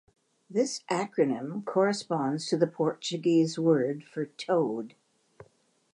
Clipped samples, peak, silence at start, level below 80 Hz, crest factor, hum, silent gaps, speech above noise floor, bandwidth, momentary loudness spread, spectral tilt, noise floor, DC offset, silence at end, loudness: under 0.1%; -10 dBFS; 0.5 s; -80 dBFS; 18 dB; none; none; 39 dB; 11 kHz; 9 LU; -5.5 dB/octave; -66 dBFS; under 0.1%; 1.05 s; -29 LUFS